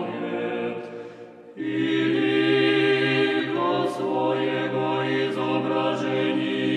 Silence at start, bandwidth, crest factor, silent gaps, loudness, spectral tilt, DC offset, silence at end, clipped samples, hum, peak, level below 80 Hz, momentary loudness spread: 0 s; 10 kHz; 14 dB; none; -23 LUFS; -6.5 dB/octave; under 0.1%; 0 s; under 0.1%; none; -10 dBFS; -76 dBFS; 13 LU